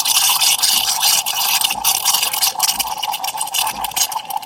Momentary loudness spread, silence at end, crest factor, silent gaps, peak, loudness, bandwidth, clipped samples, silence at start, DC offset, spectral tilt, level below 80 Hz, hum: 8 LU; 0 s; 18 dB; none; 0 dBFS; -15 LUFS; 17 kHz; under 0.1%; 0 s; under 0.1%; 2.5 dB/octave; -54 dBFS; none